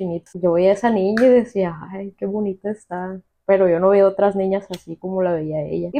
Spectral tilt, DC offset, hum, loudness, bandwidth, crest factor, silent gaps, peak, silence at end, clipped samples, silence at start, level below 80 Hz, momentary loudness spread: -8 dB/octave; under 0.1%; none; -19 LUFS; 9.6 kHz; 14 dB; none; -4 dBFS; 0 s; under 0.1%; 0 s; -56 dBFS; 15 LU